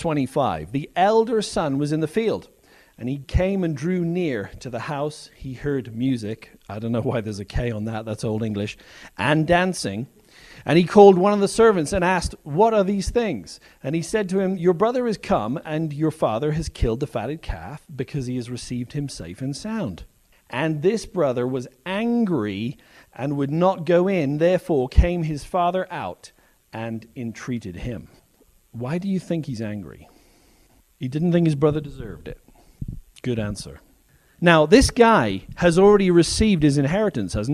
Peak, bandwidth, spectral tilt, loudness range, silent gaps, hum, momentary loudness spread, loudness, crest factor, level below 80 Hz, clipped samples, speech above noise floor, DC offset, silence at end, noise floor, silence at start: 0 dBFS; 13 kHz; -6 dB/octave; 12 LU; none; none; 17 LU; -22 LUFS; 22 dB; -36 dBFS; under 0.1%; 37 dB; under 0.1%; 0 s; -58 dBFS; 0 s